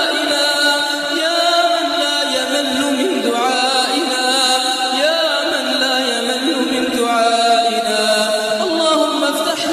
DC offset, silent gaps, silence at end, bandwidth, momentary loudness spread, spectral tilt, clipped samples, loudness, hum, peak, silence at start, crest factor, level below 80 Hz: under 0.1%; none; 0 s; 14 kHz; 4 LU; -1 dB/octave; under 0.1%; -15 LUFS; none; -2 dBFS; 0 s; 14 dB; -60 dBFS